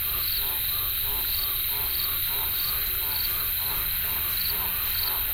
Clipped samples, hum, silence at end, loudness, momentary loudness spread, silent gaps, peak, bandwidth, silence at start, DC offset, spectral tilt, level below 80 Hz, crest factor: under 0.1%; none; 0 s; -24 LUFS; 0 LU; none; -14 dBFS; 16 kHz; 0 s; under 0.1%; -1 dB/octave; -42 dBFS; 14 dB